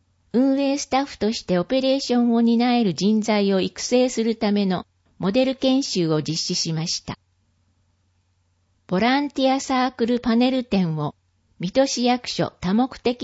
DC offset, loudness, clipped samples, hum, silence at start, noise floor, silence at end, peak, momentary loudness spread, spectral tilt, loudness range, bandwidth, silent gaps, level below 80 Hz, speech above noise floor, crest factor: under 0.1%; -21 LUFS; under 0.1%; none; 0.35 s; -66 dBFS; 0 s; -6 dBFS; 6 LU; -5 dB/octave; 5 LU; 8 kHz; none; -54 dBFS; 45 dB; 16 dB